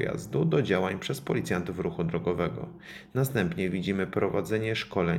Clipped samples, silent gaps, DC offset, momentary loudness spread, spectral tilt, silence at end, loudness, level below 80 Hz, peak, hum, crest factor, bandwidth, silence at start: under 0.1%; none; under 0.1%; 7 LU; -6.5 dB/octave; 0 s; -29 LUFS; -56 dBFS; -10 dBFS; none; 18 dB; 17 kHz; 0 s